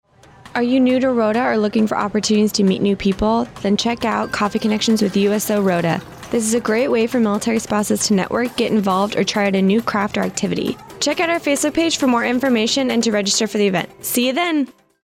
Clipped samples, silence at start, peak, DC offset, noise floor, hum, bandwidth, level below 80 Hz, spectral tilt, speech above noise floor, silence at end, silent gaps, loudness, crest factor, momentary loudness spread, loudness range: under 0.1%; 0.45 s; -6 dBFS; under 0.1%; -44 dBFS; none; 16.5 kHz; -48 dBFS; -4.5 dB/octave; 27 dB; 0.3 s; none; -18 LUFS; 12 dB; 5 LU; 1 LU